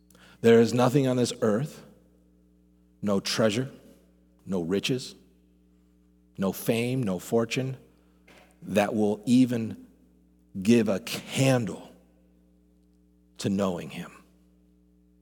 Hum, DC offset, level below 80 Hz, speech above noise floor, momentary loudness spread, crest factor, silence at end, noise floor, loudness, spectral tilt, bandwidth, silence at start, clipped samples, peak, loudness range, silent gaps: none; under 0.1%; -66 dBFS; 36 dB; 15 LU; 20 dB; 1.1 s; -61 dBFS; -26 LUFS; -5.5 dB/octave; 19 kHz; 0.45 s; under 0.1%; -8 dBFS; 6 LU; none